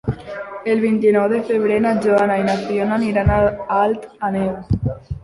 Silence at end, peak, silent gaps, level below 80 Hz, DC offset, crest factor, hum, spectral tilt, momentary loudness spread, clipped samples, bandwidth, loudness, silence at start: 0.05 s; -2 dBFS; none; -34 dBFS; under 0.1%; 14 dB; none; -8 dB/octave; 9 LU; under 0.1%; 11.5 kHz; -18 LUFS; 0.05 s